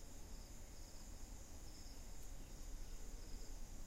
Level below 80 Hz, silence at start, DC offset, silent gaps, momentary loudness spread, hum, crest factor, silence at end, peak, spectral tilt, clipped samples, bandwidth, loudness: -52 dBFS; 0 s; under 0.1%; none; 2 LU; none; 12 dB; 0 s; -38 dBFS; -3.5 dB/octave; under 0.1%; 16.5 kHz; -57 LUFS